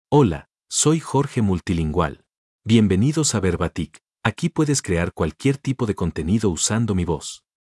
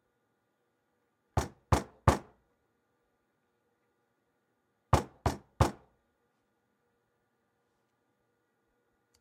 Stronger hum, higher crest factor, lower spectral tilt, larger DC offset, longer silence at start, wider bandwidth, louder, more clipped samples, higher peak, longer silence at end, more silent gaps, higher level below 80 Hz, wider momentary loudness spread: neither; second, 18 dB vs 28 dB; about the same, -5 dB/octave vs -6 dB/octave; neither; second, 0.1 s vs 1.35 s; second, 12 kHz vs 16 kHz; first, -21 LUFS vs -32 LUFS; neither; first, -2 dBFS vs -10 dBFS; second, 0.4 s vs 3.45 s; first, 2.37-2.59 s vs none; about the same, -44 dBFS vs -48 dBFS; about the same, 9 LU vs 7 LU